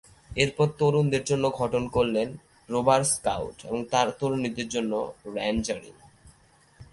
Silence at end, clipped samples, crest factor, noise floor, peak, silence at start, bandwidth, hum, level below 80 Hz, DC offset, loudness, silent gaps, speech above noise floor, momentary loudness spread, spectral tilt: 0.1 s; under 0.1%; 20 dB; -59 dBFS; -6 dBFS; 0.3 s; 12 kHz; none; -50 dBFS; under 0.1%; -26 LUFS; none; 33 dB; 10 LU; -4.5 dB/octave